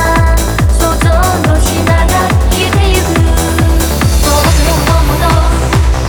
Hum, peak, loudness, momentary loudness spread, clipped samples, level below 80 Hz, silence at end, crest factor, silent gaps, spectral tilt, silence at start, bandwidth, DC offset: none; 0 dBFS; -10 LUFS; 2 LU; under 0.1%; -12 dBFS; 0 s; 8 dB; none; -5 dB/octave; 0 s; over 20 kHz; under 0.1%